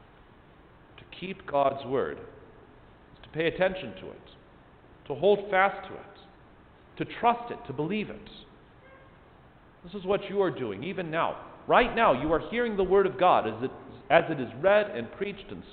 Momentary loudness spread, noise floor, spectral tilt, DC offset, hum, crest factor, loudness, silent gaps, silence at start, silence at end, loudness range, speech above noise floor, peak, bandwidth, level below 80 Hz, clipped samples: 19 LU; -55 dBFS; -9.5 dB/octave; under 0.1%; none; 24 dB; -27 LUFS; none; 1 s; 0 s; 9 LU; 28 dB; -6 dBFS; 4.6 kHz; -54 dBFS; under 0.1%